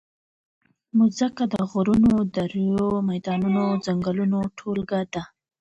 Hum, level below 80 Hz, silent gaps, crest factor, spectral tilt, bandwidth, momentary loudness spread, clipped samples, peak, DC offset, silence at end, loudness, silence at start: none; -52 dBFS; none; 12 dB; -7.5 dB/octave; 8.2 kHz; 8 LU; under 0.1%; -10 dBFS; under 0.1%; 0.35 s; -23 LUFS; 0.95 s